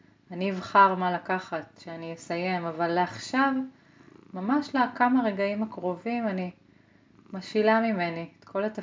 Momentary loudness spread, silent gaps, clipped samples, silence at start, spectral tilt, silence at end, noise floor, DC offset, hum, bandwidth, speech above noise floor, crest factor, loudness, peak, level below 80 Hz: 16 LU; none; under 0.1%; 0.3 s; -6 dB/octave; 0 s; -59 dBFS; under 0.1%; none; 7.6 kHz; 32 dB; 22 dB; -27 LUFS; -6 dBFS; -74 dBFS